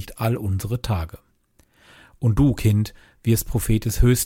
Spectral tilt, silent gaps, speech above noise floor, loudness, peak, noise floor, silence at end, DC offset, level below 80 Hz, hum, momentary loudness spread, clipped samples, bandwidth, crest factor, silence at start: -6 dB/octave; none; 40 dB; -22 LUFS; -6 dBFS; -61 dBFS; 0 s; under 0.1%; -30 dBFS; none; 9 LU; under 0.1%; 17 kHz; 16 dB; 0 s